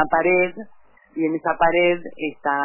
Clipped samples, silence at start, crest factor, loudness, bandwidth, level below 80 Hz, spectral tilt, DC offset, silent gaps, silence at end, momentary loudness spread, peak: under 0.1%; 0 s; 16 dB; -20 LUFS; 3.1 kHz; -52 dBFS; -9.5 dB/octave; under 0.1%; none; 0 s; 12 LU; -6 dBFS